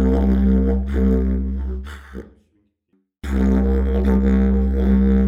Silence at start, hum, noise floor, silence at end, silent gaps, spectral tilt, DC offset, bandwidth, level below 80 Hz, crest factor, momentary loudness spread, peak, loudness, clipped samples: 0 s; none; -67 dBFS; 0 s; none; -10 dB/octave; under 0.1%; 4 kHz; -22 dBFS; 12 dB; 18 LU; -4 dBFS; -19 LUFS; under 0.1%